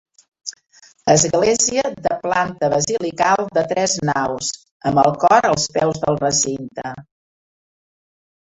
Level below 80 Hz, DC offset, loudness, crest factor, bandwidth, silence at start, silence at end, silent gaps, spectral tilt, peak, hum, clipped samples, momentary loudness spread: -52 dBFS; under 0.1%; -18 LUFS; 18 dB; 8.4 kHz; 0.45 s; 1.45 s; 4.71-4.80 s; -3.5 dB/octave; -2 dBFS; none; under 0.1%; 15 LU